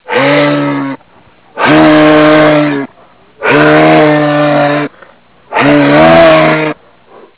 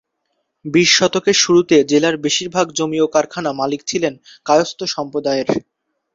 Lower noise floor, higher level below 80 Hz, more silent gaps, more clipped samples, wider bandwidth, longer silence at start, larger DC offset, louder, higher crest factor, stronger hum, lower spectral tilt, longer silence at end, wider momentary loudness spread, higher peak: second, -43 dBFS vs -71 dBFS; first, -40 dBFS vs -58 dBFS; neither; first, 2% vs under 0.1%; second, 4 kHz vs 7.8 kHz; second, 0.1 s vs 0.65 s; neither; first, -7 LUFS vs -16 LUFS; second, 8 dB vs 16 dB; neither; first, -10 dB/octave vs -3 dB/octave; about the same, 0.65 s vs 0.55 s; first, 13 LU vs 10 LU; about the same, 0 dBFS vs 0 dBFS